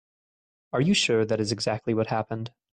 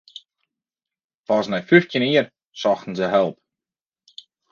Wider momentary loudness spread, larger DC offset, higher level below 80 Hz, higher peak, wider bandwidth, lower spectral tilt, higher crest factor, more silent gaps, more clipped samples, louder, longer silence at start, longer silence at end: about the same, 10 LU vs 8 LU; neither; about the same, -62 dBFS vs -66 dBFS; second, -12 dBFS vs 0 dBFS; first, 10.5 kHz vs 7.2 kHz; second, -4.5 dB/octave vs -6 dB/octave; second, 16 dB vs 22 dB; second, none vs 2.46-2.52 s; neither; second, -25 LUFS vs -20 LUFS; second, 0.75 s vs 1.3 s; second, 0.25 s vs 1.2 s